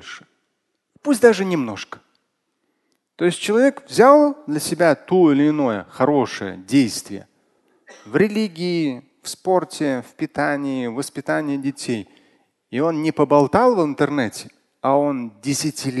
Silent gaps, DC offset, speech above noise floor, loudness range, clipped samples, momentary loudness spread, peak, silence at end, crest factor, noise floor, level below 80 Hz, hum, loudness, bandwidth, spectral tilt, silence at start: none; under 0.1%; 55 dB; 7 LU; under 0.1%; 13 LU; 0 dBFS; 0 s; 20 dB; -73 dBFS; -60 dBFS; none; -19 LUFS; 12.5 kHz; -5.5 dB/octave; 0.05 s